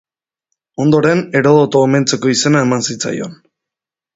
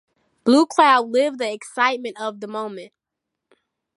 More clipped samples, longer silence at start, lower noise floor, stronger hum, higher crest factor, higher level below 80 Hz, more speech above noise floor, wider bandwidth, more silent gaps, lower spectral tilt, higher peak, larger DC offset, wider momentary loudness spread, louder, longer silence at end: neither; first, 0.8 s vs 0.45 s; first, -86 dBFS vs -82 dBFS; neither; second, 14 dB vs 20 dB; first, -54 dBFS vs -74 dBFS; first, 73 dB vs 63 dB; second, 8 kHz vs 11.5 kHz; neither; first, -5 dB/octave vs -3.5 dB/octave; about the same, 0 dBFS vs -2 dBFS; neither; second, 11 LU vs 15 LU; first, -13 LUFS vs -19 LUFS; second, 0.8 s vs 1.1 s